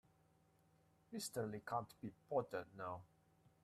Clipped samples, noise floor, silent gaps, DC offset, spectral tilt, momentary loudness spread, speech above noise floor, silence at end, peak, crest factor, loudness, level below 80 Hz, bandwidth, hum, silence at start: under 0.1%; -75 dBFS; none; under 0.1%; -5 dB/octave; 11 LU; 29 dB; 0.6 s; -28 dBFS; 20 dB; -47 LUFS; -80 dBFS; 14 kHz; none; 1.1 s